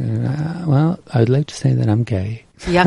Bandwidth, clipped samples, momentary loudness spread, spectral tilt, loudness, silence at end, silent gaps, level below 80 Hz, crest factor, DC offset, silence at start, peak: 11 kHz; under 0.1%; 6 LU; -7.5 dB/octave; -18 LUFS; 0 s; none; -42 dBFS; 16 dB; under 0.1%; 0 s; 0 dBFS